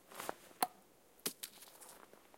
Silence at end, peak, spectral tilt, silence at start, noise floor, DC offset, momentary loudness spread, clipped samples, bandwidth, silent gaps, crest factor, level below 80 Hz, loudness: 0 s; -14 dBFS; -1 dB/octave; 0 s; -66 dBFS; under 0.1%; 16 LU; under 0.1%; 16.5 kHz; none; 34 dB; -86 dBFS; -44 LUFS